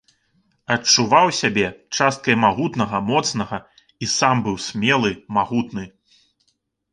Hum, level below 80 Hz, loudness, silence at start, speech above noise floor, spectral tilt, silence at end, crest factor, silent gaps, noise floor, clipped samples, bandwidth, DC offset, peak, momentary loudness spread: none; -54 dBFS; -19 LUFS; 0.7 s; 50 dB; -3.5 dB/octave; 1.05 s; 18 dB; none; -69 dBFS; under 0.1%; 11 kHz; under 0.1%; -2 dBFS; 14 LU